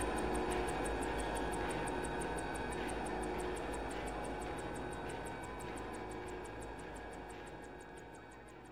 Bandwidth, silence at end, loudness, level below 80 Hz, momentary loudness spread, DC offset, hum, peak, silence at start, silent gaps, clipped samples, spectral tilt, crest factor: 16.5 kHz; 0 s; -42 LUFS; -50 dBFS; 13 LU; 0.1%; none; -26 dBFS; 0 s; none; under 0.1%; -4.5 dB/octave; 16 dB